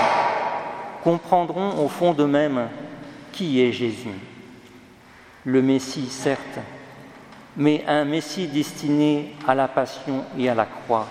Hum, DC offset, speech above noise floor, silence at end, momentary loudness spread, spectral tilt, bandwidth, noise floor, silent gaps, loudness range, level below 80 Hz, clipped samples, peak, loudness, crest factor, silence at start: none; under 0.1%; 26 dB; 0 s; 18 LU; -6 dB/octave; 15 kHz; -48 dBFS; none; 4 LU; -64 dBFS; under 0.1%; -2 dBFS; -23 LUFS; 20 dB; 0 s